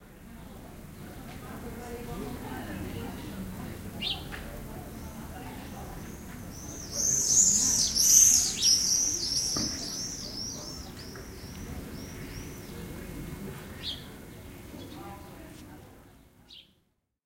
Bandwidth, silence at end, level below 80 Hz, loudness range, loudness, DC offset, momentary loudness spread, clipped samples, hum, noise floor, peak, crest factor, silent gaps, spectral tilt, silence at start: 17 kHz; 0.65 s; -48 dBFS; 20 LU; -24 LUFS; under 0.1%; 25 LU; under 0.1%; none; -73 dBFS; -6 dBFS; 26 dB; none; -1 dB/octave; 0 s